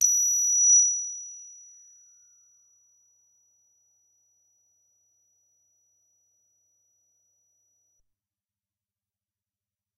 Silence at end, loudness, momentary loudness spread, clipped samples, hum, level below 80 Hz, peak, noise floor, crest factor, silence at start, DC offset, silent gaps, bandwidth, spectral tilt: 8.45 s; -19 LUFS; 28 LU; under 0.1%; none; -88 dBFS; -8 dBFS; under -90 dBFS; 22 dB; 0 s; under 0.1%; none; 12 kHz; 6 dB/octave